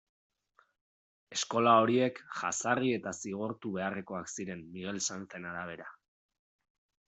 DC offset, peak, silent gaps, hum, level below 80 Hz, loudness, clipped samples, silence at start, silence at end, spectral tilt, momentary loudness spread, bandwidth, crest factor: under 0.1%; -12 dBFS; none; none; -76 dBFS; -32 LUFS; under 0.1%; 1.3 s; 1.15 s; -4 dB/octave; 16 LU; 8.2 kHz; 22 dB